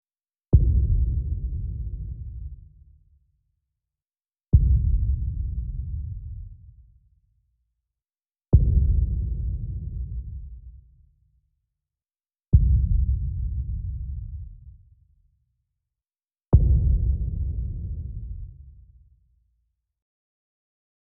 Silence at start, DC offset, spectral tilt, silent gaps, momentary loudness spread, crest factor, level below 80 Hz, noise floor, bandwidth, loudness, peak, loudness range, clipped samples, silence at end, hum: 0.5 s; under 0.1%; -17 dB/octave; none; 20 LU; 22 dB; -28 dBFS; under -90 dBFS; 1.2 kHz; -25 LUFS; -4 dBFS; 10 LU; under 0.1%; 2.3 s; none